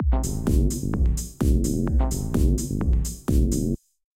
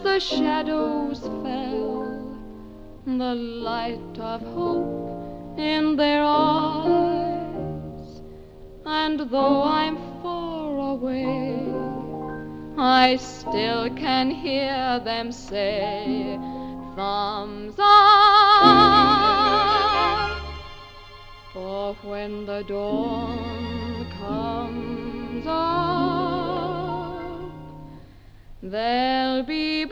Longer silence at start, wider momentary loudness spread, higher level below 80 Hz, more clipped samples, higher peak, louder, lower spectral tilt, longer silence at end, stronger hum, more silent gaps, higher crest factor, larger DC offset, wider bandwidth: about the same, 0 s vs 0 s; second, 3 LU vs 18 LU; first, -24 dBFS vs -44 dBFS; neither; second, -8 dBFS vs -2 dBFS; about the same, -24 LUFS vs -22 LUFS; about the same, -6.5 dB/octave vs -5.5 dB/octave; first, 0.45 s vs 0 s; neither; neither; second, 14 dB vs 22 dB; neither; first, 16 kHz vs 9.4 kHz